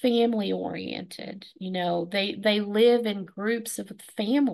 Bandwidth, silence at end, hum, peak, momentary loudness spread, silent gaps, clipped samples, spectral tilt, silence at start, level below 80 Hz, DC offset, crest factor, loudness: 12.5 kHz; 0 s; none; -10 dBFS; 16 LU; none; under 0.1%; -5 dB/octave; 0 s; -72 dBFS; under 0.1%; 16 dB; -26 LUFS